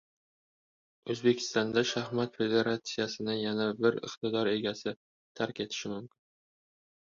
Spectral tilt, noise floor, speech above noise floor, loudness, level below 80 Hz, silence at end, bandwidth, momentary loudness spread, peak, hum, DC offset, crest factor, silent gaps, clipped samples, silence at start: -4.5 dB/octave; under -90 dBFS; over 59 dB; -32 LUFS; -72 dBFS; 0.95 s; 7.6 kHz; 10 LU; -12 dBFS; none; under 0.1%; 20 dB; 4.96-5.35 s; under 0.1%; 1.05 s